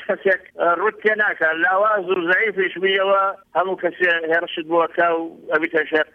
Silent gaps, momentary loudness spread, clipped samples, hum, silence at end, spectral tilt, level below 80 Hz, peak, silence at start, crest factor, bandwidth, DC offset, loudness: none; 5 LU; under 0.1%; none; 0.1 s; -6 dB/octave; -68 dBFS; -6 dBFS; 0 s; 14 dB; 6 kHz; under 0.1%; -19 LUFS